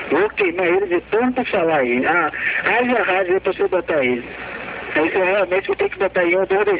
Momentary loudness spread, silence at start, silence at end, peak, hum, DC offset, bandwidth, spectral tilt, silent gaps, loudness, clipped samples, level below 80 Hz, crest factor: 5 LU; 0 s; 0 s; -4 dBFS; none; under 0.1%; 4 kHz; -8.5 dB/octave; none; -18 LUFS; under 0.1%; -50 dBFS; 14 dB